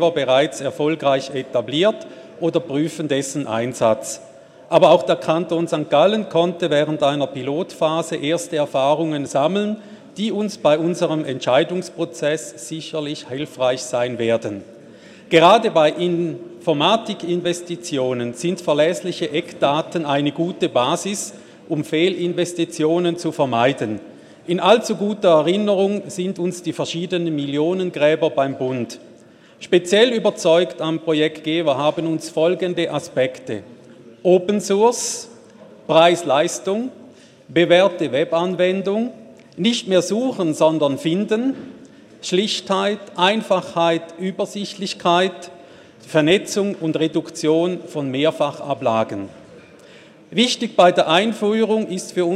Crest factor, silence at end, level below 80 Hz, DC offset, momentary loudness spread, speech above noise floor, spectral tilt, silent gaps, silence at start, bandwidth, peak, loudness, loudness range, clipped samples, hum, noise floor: 20 dB; 0 s; -68 dBFS; under 0.1%; 11 LU; 28 dB; -4.5 dB/octave; none; 0 s; 14 kHz; 0 dBFS; -19 LUFS; 3 LU; under 0.1%; none; -47 dBFS